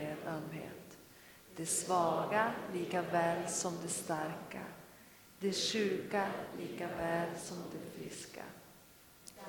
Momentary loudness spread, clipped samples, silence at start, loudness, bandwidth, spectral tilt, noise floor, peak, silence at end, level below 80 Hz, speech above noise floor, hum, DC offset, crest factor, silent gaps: 22 LU; under 0.1%; 0 s; -37 LUFS; 19 kHz; -3.5 dB/octave; -61 dBFS; -18 dBFS; 0 s; -72 dBFS; 24 dB; none; under 0.1%; 20 dB; none